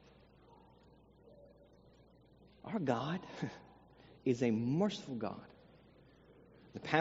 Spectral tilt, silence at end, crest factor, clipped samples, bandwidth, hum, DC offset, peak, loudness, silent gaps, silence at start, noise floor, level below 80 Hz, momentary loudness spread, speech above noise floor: -5.5 dB/octave; 0 s; 28 dB; under 0.1%; 7.6 kHz; none; under 0.1%; -14 dBFS; -38 LUFS; none; 1.3 s; -64 dBFS; -72 dBFS; 21 LU; 28 dB